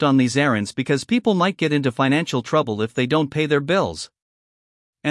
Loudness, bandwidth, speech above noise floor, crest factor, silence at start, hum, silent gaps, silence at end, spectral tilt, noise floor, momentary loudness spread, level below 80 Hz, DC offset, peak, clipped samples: -20 LUFS; 12 kHz; over 70 dB; 16 dB; 0 s; none; 4.22-4.93 s; 0 s; -5.5 dB/octave; under -90 dBFS; 6 LU; -60 dBFS; under 0.1%; -4 dBFS; under 0.1%